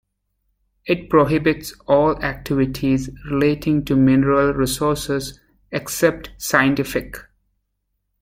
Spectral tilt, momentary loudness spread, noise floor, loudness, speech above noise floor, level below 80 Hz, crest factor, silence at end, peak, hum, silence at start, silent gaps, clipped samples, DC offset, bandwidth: -5.5 dB/octave; 12 LU; -73 dBFS; -19 LUFS; 55 dB; -42 dBFS; 18 dB; 1 s; -2 dBFS; none; 0.85 s; none; under 0.1%; under 0.1%; 16.5 kHz